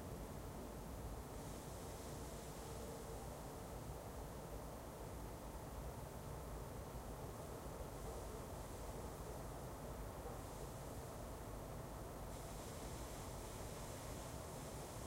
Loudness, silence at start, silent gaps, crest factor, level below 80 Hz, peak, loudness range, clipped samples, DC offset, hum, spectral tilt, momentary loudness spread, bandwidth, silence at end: -51 LUFS; 0 s; none; 14 dB; -56 dBFS; -36 dBFS; 1 LU; under 0.1%; under 0.1%; none; -5 dB/octave; 1 LU; 16 kHz; 0 s